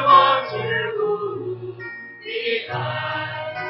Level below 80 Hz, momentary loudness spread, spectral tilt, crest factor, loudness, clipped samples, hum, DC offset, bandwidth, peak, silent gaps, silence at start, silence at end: -62 dBFS; 16 LU; -8 dB/octave; 20 dB; -22 LUFS; under 0.1%; none; under 0.1%; 5.8 kHz; -2 dBFS; none; 0 s; 0 s